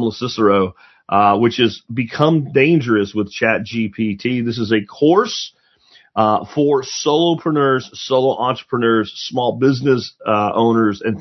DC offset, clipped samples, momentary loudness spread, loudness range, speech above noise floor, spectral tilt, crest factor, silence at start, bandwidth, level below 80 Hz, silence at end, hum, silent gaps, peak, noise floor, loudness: under 0.1%; under 0.1%; 7 LU; 2 LU; 35 dB; -6 dB/octave; 16 dB; 0 s; 6.2 kHz; -60 dBFS; 0 s; none; none; 0 dBFS; -52 dBFS; -17 LUFS